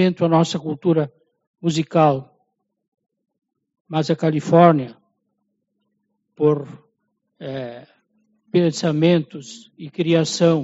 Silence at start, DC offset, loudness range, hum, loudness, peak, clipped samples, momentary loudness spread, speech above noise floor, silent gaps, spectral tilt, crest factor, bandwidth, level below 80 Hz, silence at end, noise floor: 0 s; under 0.1%; 7 LU; none; -19 LUFS; 0 dBFS; under 0.1%; 19 LU; 55 dB; 1.47-1.54 s, 2.88-2.92 s, 3.80-3.85 s; -6.5 dB/octave; 20 dB; 8 kHz; -64 dBFS; 0 s; -73 dBFS